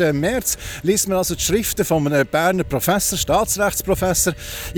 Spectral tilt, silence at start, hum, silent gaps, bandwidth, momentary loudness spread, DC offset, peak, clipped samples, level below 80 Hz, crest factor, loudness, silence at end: -3.5 dB/octave; 0 s; none; none; over 20 kHz; 3 LU; under 0.1%; -4 dBFS; under 0.1%; -36 dBFS; 14 dB; -19 LUFS; 0 s